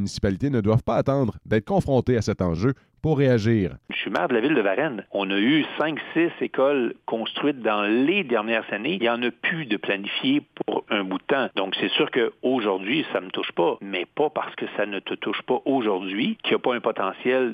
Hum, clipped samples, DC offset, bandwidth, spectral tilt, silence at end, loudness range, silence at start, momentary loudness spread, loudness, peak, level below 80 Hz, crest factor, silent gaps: none; under 0.1%; under 0.1%; 11 kHz; -6.5 dB/octave; 0 s; 3 LU; 0 s; 7 LU; -24 LUFS; -10 dBFS; -50 dBFS; 14 dB; none